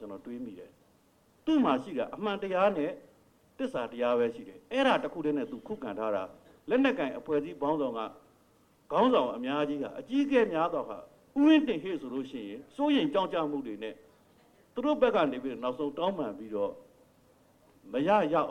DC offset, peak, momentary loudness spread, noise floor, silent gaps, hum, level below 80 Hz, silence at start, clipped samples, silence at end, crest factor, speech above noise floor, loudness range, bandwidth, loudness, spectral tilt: under 0.1%; -12 dBFS; 15 LU; -65 dBFS; none; none; -68 dBFS; 0 s; under 0.1%; 0 s; 20 dB; 36 dB; 4 LU; 9.8 kHz; -30 LUFS; -6.5 dB/octave